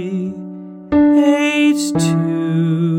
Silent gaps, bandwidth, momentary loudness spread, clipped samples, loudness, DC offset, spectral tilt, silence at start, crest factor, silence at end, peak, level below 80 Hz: none; 15.5 kHz; 16 LU; under 0.1%; -15 LUFS; under 0.1%; -6 dB/octave; 0 s; 12 dB; 0 s; -4 dBFS; -46 dBFS